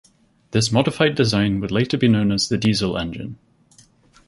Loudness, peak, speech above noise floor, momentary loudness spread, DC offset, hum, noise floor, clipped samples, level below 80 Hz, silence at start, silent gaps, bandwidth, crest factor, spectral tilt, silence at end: -19 LUFS; -2 dBFS; 35 dB; 9 LU; under 0.1%; none; -54 dBFS; under 0.1%; -46 dBFS; 0.5 s; none; 11.5 kHz; 20 dB; -5.5 dB/octave; 0.95 s